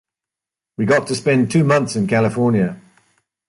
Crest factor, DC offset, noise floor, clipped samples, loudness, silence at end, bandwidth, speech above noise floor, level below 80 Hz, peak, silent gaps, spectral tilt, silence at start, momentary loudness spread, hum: 16 dB; under 0.1%; -87 dBFS; under 0.1%; -17 LUFS; 0.7 s; 11.5 kHz; 71 dB; -54 dBFS; -4 dBFS; none; -6.5 dB/octave; 0.8 s; 8 LU; none